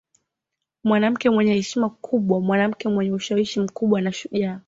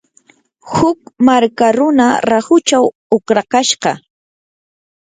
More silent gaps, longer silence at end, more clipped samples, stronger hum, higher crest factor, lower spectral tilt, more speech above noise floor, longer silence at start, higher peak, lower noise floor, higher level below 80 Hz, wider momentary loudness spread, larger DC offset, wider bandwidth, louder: second, none vs 2.95-3.10 s; second, 0.05 s vs 1.05 s; neither; neither; about the same, 16 dB vs 14 dB; first, -6 dB/octave vs -4 dB/octave; first, 62 dB vs 40 dB; first, 0.85 s vs 0.65 s; second, -6 dBFS vs 0 dBFS; first, -83 dBFS vs -52 dBFS; second, -62 dBFS vs -52 dBFS; about the same, 6 LU vs 6 LU; neither; second, 7.8 kHz vs 9.6 kHz; second, -22 LUFS vs -13 LUFS